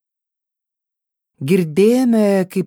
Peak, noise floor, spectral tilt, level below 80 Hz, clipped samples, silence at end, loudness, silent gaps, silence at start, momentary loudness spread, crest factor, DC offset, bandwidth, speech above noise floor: -2 dBFS; -84 dBFS; -7 dB/octave; -66 dBFS; under 0.1%; 0 s; -15 LUFS; none; 1.4 s; 5 LU; 16 dB; under 0.1%; 18 kHz; 70 dB